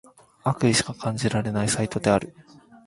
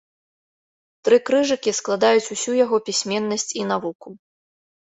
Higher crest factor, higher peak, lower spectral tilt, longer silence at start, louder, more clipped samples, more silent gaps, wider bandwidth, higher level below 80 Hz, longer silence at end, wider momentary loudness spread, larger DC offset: about the same, 20 dB vs 18 dB; about the same, -4 dBFS vs -4 dBFS; first, -4.5 dB/octave vs -3 dB/octave; second, 0.45 s vs 1.05 s; second, -24 LUFS vs -20 LUFS; neither; second, none vs 3.95-4.00 s; first, 11.5 kHz vs 8.4 kHz; first, -52 dBFS vs -68 dBFS; second, 0.45 s vs 0.75 s; about the same, 8 LU vs 8 LU; neither